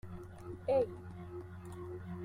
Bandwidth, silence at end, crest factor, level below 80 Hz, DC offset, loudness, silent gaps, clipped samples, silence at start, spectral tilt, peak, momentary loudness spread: 13 kHz; 0 s; 18 dB; -62 dBFS; under 0.1%; -40 LUFS; none; under 0.1%; 0.05 s; -8 dB/octave; -22 dBFS; 15 LU